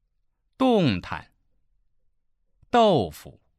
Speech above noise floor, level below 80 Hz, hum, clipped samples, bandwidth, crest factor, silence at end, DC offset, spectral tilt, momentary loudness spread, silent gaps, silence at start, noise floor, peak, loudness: 49 dB; -56 dBFS; none; under 0.1%; 14.5 kHz; 18 dB; 0.3 s; under 0.1%; -6.5 dB/octave; 15 LU; none; 0.6 s; -71 dBFS; -8 dBFS; -22 LUFS